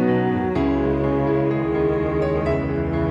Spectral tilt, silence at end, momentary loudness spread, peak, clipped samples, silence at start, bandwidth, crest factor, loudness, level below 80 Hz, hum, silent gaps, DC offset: -9.5 dB/octave; 0 s; 2 LU; -8 dBFS; under 0.1%; 0 s; 7.4 kHz; 12 dB; -21 LUFS; -34 dBFS; none; none; under 0.1%